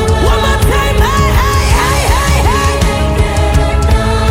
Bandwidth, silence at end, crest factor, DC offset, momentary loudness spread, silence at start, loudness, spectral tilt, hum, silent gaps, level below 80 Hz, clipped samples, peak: 16.5 kHz; 0 s; 10 dB; under 0.1%; 2 LU; 0 s; -11 LUFS; -5 dB/octave; none; none; -14 dBFS; under 0.1%; 0 dBFS